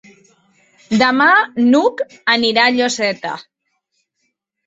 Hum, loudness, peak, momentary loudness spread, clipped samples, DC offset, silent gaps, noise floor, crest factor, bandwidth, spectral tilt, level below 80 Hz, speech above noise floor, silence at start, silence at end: none; -14 LUFS; 0 dBFS; 11 LU; under 0.1%; under 0.1%; none; -70 dBFS; 16 dB; 8 kHz; -3.5 dB/octave; -60 dBFS; 56 dB; 0.9 s; 1.25 s